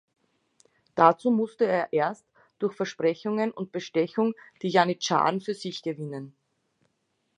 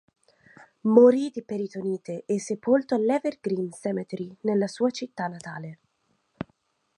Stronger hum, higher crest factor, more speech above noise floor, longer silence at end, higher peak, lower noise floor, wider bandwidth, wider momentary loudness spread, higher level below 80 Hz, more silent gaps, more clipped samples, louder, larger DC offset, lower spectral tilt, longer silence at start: neither; about the same, 24 dB vs 22 dB; about the same, 50 dB vs 47 dB; first, 1.1 s vs 0.55 s; about the same, -4 dBFS vs -4 dBFS; about the same, -75 dBFS vs -72 dBFS; about the same, 10.5 kHz vs 11 kHz; second, 14 LU vs 20 LU; second, -78 dBFS vs -72 dBFS; neither; neither; about the same, -26 LUFS vs -25 LUFS; neither; about the same, -5.5 dB/octave vs -6.5 dB/octave; about the same, 0.95 s vs 0.85 s